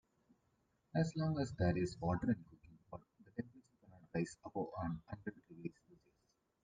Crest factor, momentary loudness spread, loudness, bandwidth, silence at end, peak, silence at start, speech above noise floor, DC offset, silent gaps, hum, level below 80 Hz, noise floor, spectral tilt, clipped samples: 20 dB; 16 LU; -42 LUFS; 9.4 kHz; 0.9 s; -24 dBFS; 0.95 s; 41 dB; under 0.1%; none; none; -66 dBFS; -81 dBFS; -7.5 dB/octave; under 0.1%